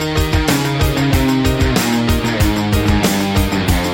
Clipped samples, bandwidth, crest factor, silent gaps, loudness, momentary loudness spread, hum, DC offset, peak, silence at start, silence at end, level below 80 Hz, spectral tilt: under 0.1%; 17 kHz; 12 dB; none; -15 LUFS; 2 LU; none; under 0.1%; -4 dBFS; 0 s; 0 s; -22 dBFS; -5 dB/octave